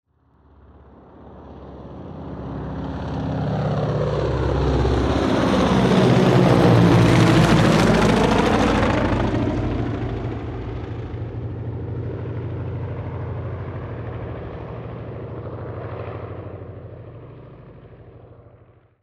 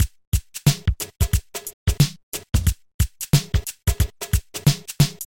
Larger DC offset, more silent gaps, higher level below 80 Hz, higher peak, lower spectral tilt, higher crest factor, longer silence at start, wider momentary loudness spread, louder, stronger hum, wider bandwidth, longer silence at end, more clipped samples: second, under 0.1% vs 0.1%; second, none vs 0.27-0.32 s, 1.73-1.86 s, 2.23-2.32 s, 2.94-2.99 s; second, -34 dBFS vs -28 dBFS; about the same, -2 dBFS vs -2 dBFS; first, -7 dB/octave vs -4.5 dB/octave; about the same, 18 dB vs 20 dB; first, 1.2 s vs 0 s; first, 21 LU vs 6 LU; first, -20 LUFS vs -23 LUFS; neither; second, 13 kHz vs 17 kHz; first, 0.6 s vs 0.05 s; neither